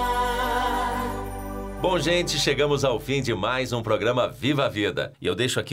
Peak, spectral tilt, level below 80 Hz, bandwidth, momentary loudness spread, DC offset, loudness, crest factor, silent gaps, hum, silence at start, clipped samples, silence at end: -12 dBFS; -4.5 dB/octave; -40 dBFS; 16 kHz; 7 LU; under 0.1%; -24 LUFS; 14 dB; none; none; 0 s; under 0.1%; 0 s